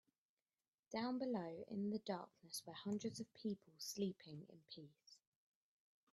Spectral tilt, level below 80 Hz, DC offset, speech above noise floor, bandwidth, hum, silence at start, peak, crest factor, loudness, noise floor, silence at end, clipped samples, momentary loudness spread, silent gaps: -5 dB/octave; -88 dBFS; under 0.1%; over 43 dB; 12.5 kHz; none; 0.9 s; -30 dBFS; 18 dB; -47 LUFS; under -90 dBFS; 0.95 s; under 0.1%; 14 LU; none